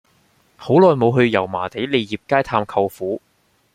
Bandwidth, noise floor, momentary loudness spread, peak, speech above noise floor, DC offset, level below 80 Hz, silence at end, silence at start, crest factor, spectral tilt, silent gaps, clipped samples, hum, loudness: 15 kHz; -59 dBFS; 13 LU; -2 dBFS; 41 dB; under 0.1%; -54 dBFS; 0.55 s; 0.6 s; 16 dB; -7.5 dB/octave; none; under 0.1%; none; -18 LUFS